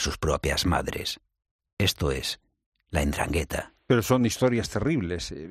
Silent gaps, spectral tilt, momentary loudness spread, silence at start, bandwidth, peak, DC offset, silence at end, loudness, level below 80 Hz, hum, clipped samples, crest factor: 1.51-1.59 s, 1.73-1.77 s, 2.66-2.72 s; -4.5 dB/octave; 10 LU; 0 s; 15.5 kHz; -8 dBFS; under 0.1%; 0 s; -27 LUFS; -40 dBFS; none; under 0.1%; 18 dB